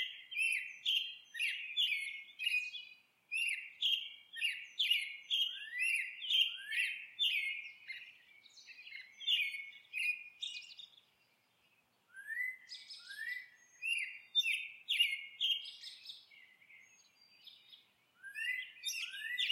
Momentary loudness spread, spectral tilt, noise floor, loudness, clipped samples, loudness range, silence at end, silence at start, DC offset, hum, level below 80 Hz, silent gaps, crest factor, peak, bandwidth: 17 LU; 5 dB/octave; -75 dBFS; -36 LUFS; under 0.1%; 10 LU; 0 s; 0 s; under 0.1%; none; under -90 dBFS; none; 20 dB; -20 dBFS; 16 kHz